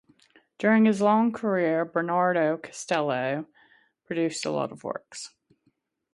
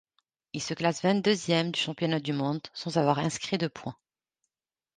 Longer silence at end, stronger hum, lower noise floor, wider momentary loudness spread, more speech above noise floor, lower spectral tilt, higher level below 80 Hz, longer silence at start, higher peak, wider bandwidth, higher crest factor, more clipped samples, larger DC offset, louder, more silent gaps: second, 0.85 s vs 1.05 s; neither; second, -71 dBFS vs under -90 dBFS; first, 15 LU vs 10 LU; second, 46 dB vs over 62 dB; about the same, -5.5 dB/octave vs -5 dB/octave; second, -74 dBFS vs -68 dBFS; about the same, 0.6 s vs 0.55 s; about the same, -8 dBFS vs -10 dBFS; first, 11.5 kHz vs 9.8 kHz; about the same, 18 dB vs 20 dB; neither; neither; about the same, -26 LUFS vs -28 LUFS; neither